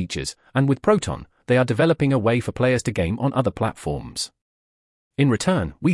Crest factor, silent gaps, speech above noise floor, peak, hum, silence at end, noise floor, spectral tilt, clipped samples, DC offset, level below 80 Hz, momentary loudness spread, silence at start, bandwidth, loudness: 16 dB; 4.41-5.11 s; over 69 dB; -6 dBFS; none; 0 s; under -90 dBFS; -6 dB/octave; under 0.1%; under 0.1%; -46 dBFS; 11 LU; 0 s; 12 kHz; -22 LUFS